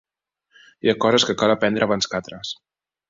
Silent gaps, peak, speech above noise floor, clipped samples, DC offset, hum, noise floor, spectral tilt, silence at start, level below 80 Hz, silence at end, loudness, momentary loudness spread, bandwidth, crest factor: none; -4 dBFS; 53 dB; under 0.1%; under 0.1%; none; -73 dBFS; -4 dB/octave; 0.85 s; -58 dBFS; 0.55 s; -20 LUFS; 14 LU; 7.8 kHz; 18 dB